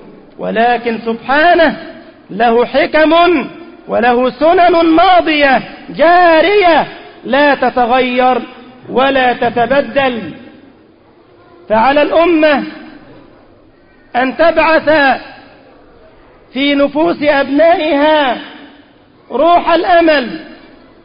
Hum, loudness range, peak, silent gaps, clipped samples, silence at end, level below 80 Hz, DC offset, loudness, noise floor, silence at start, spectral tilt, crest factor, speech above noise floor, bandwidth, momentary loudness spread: none; 5 LU; 0 dBFS; none; under 0.1%; 0.5 s; -44 dBFS; under 0.1%; -10 LUFS; -44 dBFS; 0.05 s; -10 dB/octave; 12 dB; 34 dB; 5.4 kHz; 14 LU